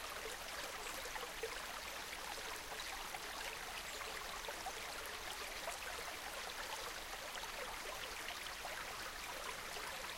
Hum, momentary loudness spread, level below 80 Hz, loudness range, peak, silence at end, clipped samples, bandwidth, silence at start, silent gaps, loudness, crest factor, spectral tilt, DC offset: none; 1 LU; -62 dBFS; 0 LU; -30 dBFS; 0 s; under 0.1%; 17 kHz; 0 s; none; -45 LUFS; 18 dB; -0.5 dB/octave; under 0.1%